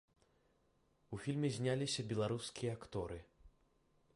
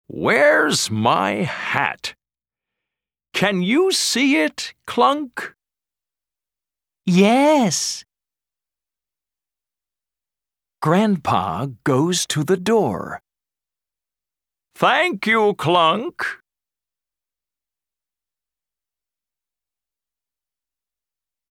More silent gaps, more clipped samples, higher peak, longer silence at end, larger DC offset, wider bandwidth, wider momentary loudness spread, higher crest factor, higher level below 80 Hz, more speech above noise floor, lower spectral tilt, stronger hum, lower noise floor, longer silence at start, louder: neither; neither; second, -26 dBFS vs -2 dBFS; second, 0.65 s vs 5.15 s; neither; second, 11.5 kHz vs 16.5 kHz; second, 10 LU vs 14 LU; about the same, 18 dB vs 20 dB; about the same, -66 dBFS vs -64 dBFS; second, 36 dB vs over 72 dB; first, -5.5 dB/octave vs -4 dB/octave; neither; second, -76 dBFS vs under -90 dBFS; first, 1.1 s vs 0.1 s; second, -41 LUFS vs -18 LUFS